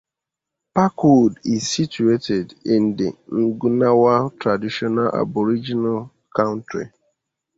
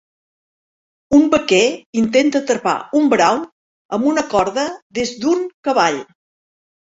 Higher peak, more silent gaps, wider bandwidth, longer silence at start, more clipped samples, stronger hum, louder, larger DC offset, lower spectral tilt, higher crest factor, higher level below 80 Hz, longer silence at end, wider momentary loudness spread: about the same, -2 dBFS vs -2 dBFS; second, none vs 1.86-1.93 s, 3.52-3.89 s, 4.82-4.90 s, 5.54-5.63 s; about the same, 8 kHz vs 8 kHz; second, 0.75 s vs 1.1 s; neither; neither; about the same, -19 LUFS vs -17 LUFS; neither; first, -6 dB/octave vs -4 dB/octave; about the same, 16 dB vs 16 dB; second, -58 dBFS vs -52 dBFS; about the same, 0.7 s vs 0.8 s; about the same, 10 LU vs 10 LU